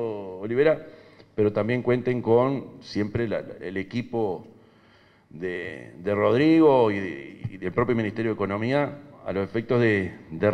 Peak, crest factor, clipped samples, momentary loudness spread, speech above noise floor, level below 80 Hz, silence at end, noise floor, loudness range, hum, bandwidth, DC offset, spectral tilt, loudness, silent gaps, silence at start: -8 dBFS; 18 dB; under 0.1%; 14 LU; 33 dB; -58 dBFS; 0 s; -57 dBFS; 8 LU; none; 9.2 kHz; under 0.1%; -8.5 dB/octave; -25 LUFS; none; 0 s